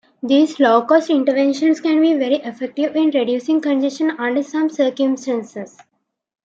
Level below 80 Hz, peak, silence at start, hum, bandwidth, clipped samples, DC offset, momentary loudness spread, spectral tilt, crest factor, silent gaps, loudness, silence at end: -74 dBFS; -2 dBFS; 0.25 s; none; 7.8 kHz; under 0.1%; under 0.1%; 9 LU; -4.5 dB/octave; 14 dB; none; -17 LUFS; 0.75 s